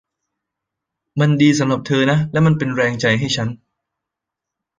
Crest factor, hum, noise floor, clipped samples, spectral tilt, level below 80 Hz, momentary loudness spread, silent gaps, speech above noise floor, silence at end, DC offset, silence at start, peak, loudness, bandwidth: 18 dB; none; -83 dBFS; under 0.1%; -6 dB/octave; -52 dBFS; 7 LU; none; 68 dB; 1.25 s; under 0.1%; 1.15 s; -2 dBFS; -17 LUFS; 9.4 kHz